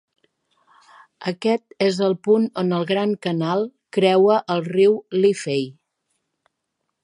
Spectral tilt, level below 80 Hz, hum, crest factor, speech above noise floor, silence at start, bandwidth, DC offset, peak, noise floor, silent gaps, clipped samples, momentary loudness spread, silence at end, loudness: -6 dB/octave; -74 dBFS; none; 18 dB; 58 dB; 1.2 s; 11 kHz; under 0.1%; -4 dBFS; -77 dBFS; none; under 0.1%; 8 LU; 1.3 s; -20 LUFS